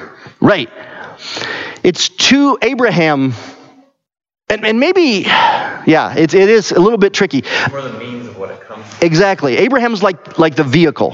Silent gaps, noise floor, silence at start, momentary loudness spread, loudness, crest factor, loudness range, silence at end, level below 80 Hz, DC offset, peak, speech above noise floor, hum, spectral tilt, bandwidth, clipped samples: none; -47 dBFS; 0 s; 17 LU; -12 LUFS; 12 dB; 3 LU; 0 s; -52 dBFS; under 0.1%; 0 dBFS; 36 dB; none; -4.5 dB/octave; 7.8 kHz; under 0.1%